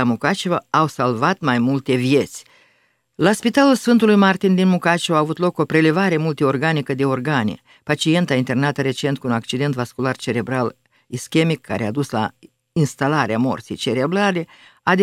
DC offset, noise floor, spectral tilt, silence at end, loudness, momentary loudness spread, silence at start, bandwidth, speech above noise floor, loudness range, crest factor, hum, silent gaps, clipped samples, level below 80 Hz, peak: under 0.1%; -62 dBFS; -6 dB/octave; 0 s; -19 LUFS; 9 LU; 0 s; 15 kHz; 44 dB; 6 LU; 18 dB; none; none; under 0.1%; -62 dBFS; 0 dBFS